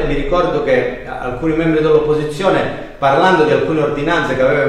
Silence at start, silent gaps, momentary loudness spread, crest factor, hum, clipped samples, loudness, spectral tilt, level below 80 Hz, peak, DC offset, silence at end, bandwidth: 0 s; none; 8 LU; 12 dB; none; under 0.1%; -15 LUFS; -6.5 dB/octave; -30 dBFS; -2 dBFS; under 0.1%; 0 s; 11.5 kHz